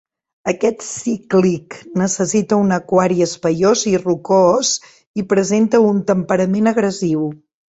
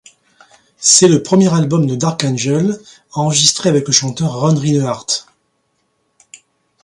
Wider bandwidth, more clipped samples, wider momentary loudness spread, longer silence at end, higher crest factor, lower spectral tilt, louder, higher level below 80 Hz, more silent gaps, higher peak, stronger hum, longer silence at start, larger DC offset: second, 8.2 kHz vs 11.5 kHz; neither; about the same, 10 LU vs 11 LU; second, 0.4 s vs 1.65 s; about the same, 16 dB vs 16 dB; about the same, -5 dB/octave vs -4 dB/octave; second, -16 LUFS vs -13 LUFS; about the same, -56 dBFS vs -56 dBFS; first, 5.07-5.14 s vs none; about the same, 0 dBFS vs 0 dBFS; neither; second, 0.45 s vs 0.8 s; neither